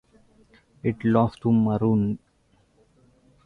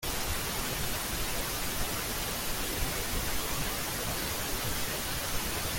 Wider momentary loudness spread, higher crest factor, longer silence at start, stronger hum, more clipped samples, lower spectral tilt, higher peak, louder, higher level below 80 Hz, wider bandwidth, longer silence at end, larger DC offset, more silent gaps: first, 8 LU vs 0 LU; about the same, 18 dB vs 16 dB; first, 0.85 s vs 0 s; neither; neither; first, -10 dB/octave vs -2.5 dB/octave; first, -6 dBFS vs -16 dBFS; first, -23 LUFS vs -32 LUFS; second, -54 dBFS vs -40 dBFS; second, 4.9 kHz vs 17 kHz; first, 1.3 s vs 0 s; neither; neither